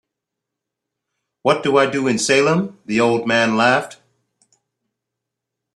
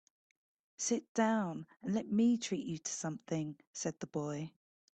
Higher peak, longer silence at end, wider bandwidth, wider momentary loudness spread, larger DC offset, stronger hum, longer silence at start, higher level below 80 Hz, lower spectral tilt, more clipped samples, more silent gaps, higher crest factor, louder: first, -2 dBFS vs -20 dBFS; first, 1.8 s vs 0.5 s; first, 12.5 kHz vs 9 kHz; second, 7 LU vs 10 LU; neither; neither; first, 1.45 s vs 0.8 s; first, -62 dBFS vs -78 dBFS; about the same, -4 dB/octave vs -4.5 dB/octave; neither; second, none vs 1.09-1.15 s, 3.67-3.73 s; about the same, 18 dB vs 18 dB; first, -17 LUFS vs -37 LUFS